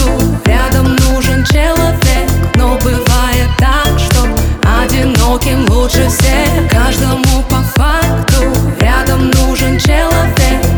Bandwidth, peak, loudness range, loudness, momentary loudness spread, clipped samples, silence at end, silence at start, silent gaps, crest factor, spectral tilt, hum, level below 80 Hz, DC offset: over 20 kHz; 0 dBFS; 0 LU; -11 LUFS; 2 LU; under 0.1%; 0 s; 0 s; none; 10 dB; -5 dB/octave; none; -14 dBFS; under 0.1%